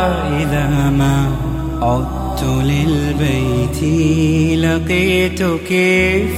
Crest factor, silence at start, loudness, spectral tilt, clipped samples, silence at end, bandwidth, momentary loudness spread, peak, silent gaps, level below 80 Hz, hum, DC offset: 12 dB; 0 s; -15 LUFS; -6.5 dB/octave; under 0.1%; 0 s; 16 kHz; 5 LU; -4 dBFS; none; -26 dBFS; none; under 0.1%